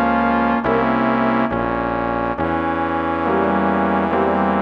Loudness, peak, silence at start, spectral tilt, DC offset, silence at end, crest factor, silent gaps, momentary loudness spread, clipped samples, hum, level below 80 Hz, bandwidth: -18 LUFS; -4 dBFS; 0 s; -8.5 dB/octave; under 0.1%; 0 s; 14 dB; none; 4 LU; under 0.1%; none; -40 dBFS; 5.8 kHz